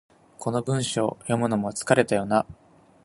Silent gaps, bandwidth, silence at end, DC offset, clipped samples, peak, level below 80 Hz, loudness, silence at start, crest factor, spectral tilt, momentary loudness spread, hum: none; 11.5 kHz; 0.5 s; under 0.1%; under 0.1%; -2 dBFS; -60 dBFS; -25 LUFS; 0.4 s; 22 dB; -5 dB/octave; 8 LU; none